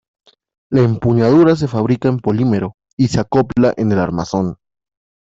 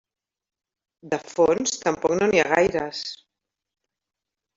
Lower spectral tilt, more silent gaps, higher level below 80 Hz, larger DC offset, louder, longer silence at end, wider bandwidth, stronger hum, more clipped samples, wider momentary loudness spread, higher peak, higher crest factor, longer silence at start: first, -8 dB/octave vs -3.5 dB/octave; first, 2.74-2.78 s, 2.93-2.97 s vs none; first, -46 dBFS vs -58 dBFS; neither; first, -15 LUFS vs -22 LUFS; second, 0.75 s vs 1.4 s; about the same, 7.8 kHz vs 7.8 kHz; neither; neither; second, 9 LU vs 13 LU; about the same, -2 dBFS vs -4 dBFS; second, 14 dB vs 20 dB; second, 0.7 s vs 1.05 s